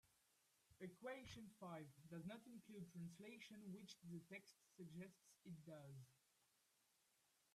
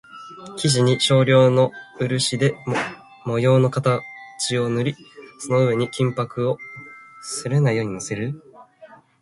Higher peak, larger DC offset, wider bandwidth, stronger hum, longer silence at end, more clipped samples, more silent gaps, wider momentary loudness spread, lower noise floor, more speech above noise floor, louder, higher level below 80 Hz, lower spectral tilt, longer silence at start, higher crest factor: second, -44 dBFS vs -4 dBFS; neither; first, 14 kHz vs 11.5 kHz; neither; first, 1.1 s vs 0.35 s; neither; neither; second, 6 LU vs 20 LU; first, -84 dBFS vs -48 dBFS; about the same, 25 dB vs 28 dB; second, -59 LUFS vs -21 LUFS; second, -88 dBFS vs -58 dBFS; about the same, -5.5 dB/octave vs -5.5 dB/octave; about the same, 0.05 s vs 0.15 s; about the same, 18 dB vs 16 dB